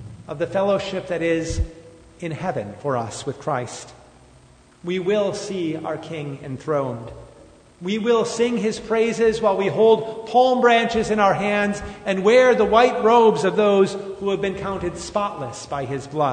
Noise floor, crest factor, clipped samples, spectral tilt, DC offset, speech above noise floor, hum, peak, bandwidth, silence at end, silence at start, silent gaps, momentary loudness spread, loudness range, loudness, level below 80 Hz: -51 dBFS; 18 dB; under 0.1%; -5 dB/octave; under 0.1%; 31 dB; none; -2 dBFS; 9.6 kHz; 0 s; 0 s; none; 15 LU; 10 LU; -20 LUFS; -42 dBFS